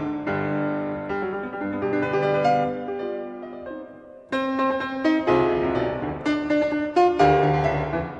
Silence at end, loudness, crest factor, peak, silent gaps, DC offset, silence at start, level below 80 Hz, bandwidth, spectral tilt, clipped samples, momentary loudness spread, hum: 0 s; -23 LUFS; 18 dB; -6 dBFS; none; under 0.1%; 0 s; -46 dBFS; 8.6 kHz; -7.5 dB/octave; under 0.1%; 12 LU; none